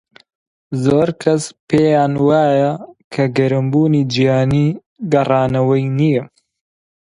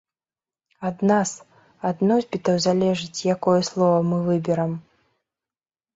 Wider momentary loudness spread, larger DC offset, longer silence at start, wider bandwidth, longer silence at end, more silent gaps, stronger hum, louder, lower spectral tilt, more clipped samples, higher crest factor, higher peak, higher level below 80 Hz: second, 6 LU vs 10 LU; neither; about the same, 0.7 s vs 0.8 s; first, 11 kHz vs 8 kHz; second, 0.85 s vs 1.15 s; first, 1.60-1.67 s, 3.04-3.11 s, 4.86-4.96 s vs none; neither; first, -15 LUFS vs -22 LUFS; about the same, -7 dB/octave vs -6 dB/octave; neither; about the same, 16 dB vs 18 dB; first, 0 dBFS vs -6 dBFS; first, -48 dBFS vs -62 dBFS